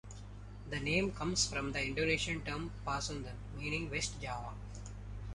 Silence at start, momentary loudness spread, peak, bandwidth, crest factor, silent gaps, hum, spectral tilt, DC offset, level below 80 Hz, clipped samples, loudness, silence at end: 0.05 s; 15 LU; -18 dBFS; 11.5 kHz; 20 dB; none; 50 Hz at -45 dBFS; -3.5 dB/octave; under 0.1%; -48 dBFS; under 0.1%; -37 LUFS; 0 s